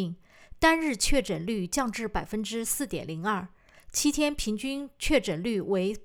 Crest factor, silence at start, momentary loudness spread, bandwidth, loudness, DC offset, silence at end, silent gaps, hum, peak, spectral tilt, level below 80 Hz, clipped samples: 20 dB; 0 s; 9 LU; 20 kHz; -28 LUFS; under 0.1%; 0 s; none; none; -8 dBFS; -3.5 dB/octave; -42 dBFS; under 0.1%